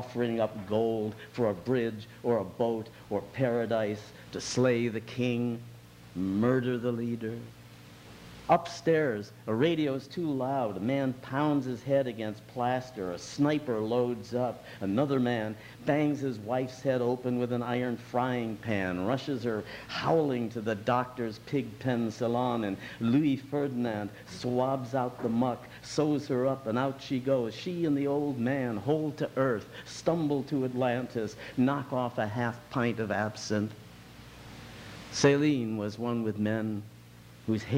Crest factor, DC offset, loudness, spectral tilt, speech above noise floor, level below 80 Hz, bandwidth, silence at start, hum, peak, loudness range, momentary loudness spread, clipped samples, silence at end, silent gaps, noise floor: 20 dB; under 0.1%; -31 LUFS; -6.5 dB/octave; 22 dB; -64 dBFS; 16.5 kHz; 0 s; none; -10 dBFS; 1 LU; 10 LU; under 0.1%; 0 s; none; -52 dBFS